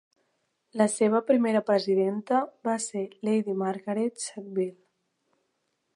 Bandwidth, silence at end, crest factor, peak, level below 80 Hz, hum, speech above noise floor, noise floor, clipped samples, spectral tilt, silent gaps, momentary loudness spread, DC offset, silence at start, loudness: 11.5 kHz; 1.2 s; 18 dB; -10 dBFS; -84 dBFS; none; 51 dB; -77 dBFS; under 0.1%; -5 dB/octave; none; 9 LU; under 0.1%; 0.75 s; -27 LUFS